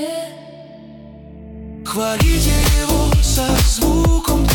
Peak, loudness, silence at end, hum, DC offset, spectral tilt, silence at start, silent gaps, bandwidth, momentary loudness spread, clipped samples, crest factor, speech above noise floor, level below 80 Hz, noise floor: -4 dBFS; -16 LUFS; 0 s; none; under 0.1%; -4.5 dB/octave; 0 s; none; 19 kHz; 21 LU; under 0.1%; 12 dB; 23 dB; -20 dBFS; -37 dBFS